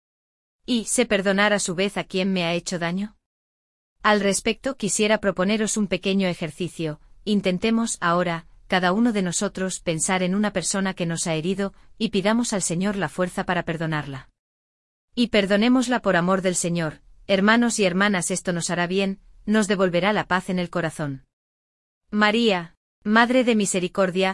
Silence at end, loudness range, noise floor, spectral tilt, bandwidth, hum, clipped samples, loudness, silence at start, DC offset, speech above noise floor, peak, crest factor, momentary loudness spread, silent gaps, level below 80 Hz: 0 s; 3 LU; under -90 dBFS; -4 dB/octave; 12 kHz; none; under 0.1%; -22 LUFS; 0.7 s; under 0.1%; over 68 dB; -4 dBFS; 18 dB; 10 LU; 3.26-3.96 s, 14.39-15.08 s, 21.33-22.01 s, 22.77-23.02 s; -52 dBFS